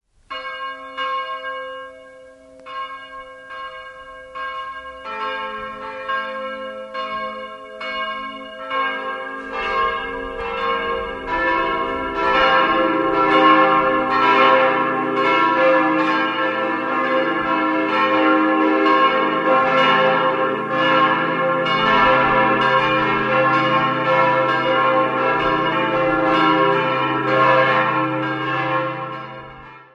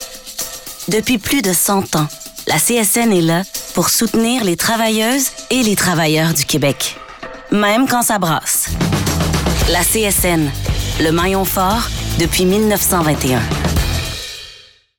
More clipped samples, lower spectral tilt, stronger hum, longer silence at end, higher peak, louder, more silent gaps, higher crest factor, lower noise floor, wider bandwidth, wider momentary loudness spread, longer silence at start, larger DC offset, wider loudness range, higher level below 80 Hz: neither; first, -6 dB/octave vs -3.5 dB/octave; neither; second, 0.15 s vs 0.4 s; first, 0 dBFS vs -6 dBFS; about the same, -17 LUFS vs -15 LUFS; neither; first, 18 dB vs 10 dB; about the same, -43 dBFS vs -42 dBFS; second, 7.8 kHz vs over 20 kHz; first, 16 LU vs 10 LU; first, 0.3 s vs 0 s; neither; first, 14 LU vs 1 LU; second, -50 dBFS vs -30 dBFS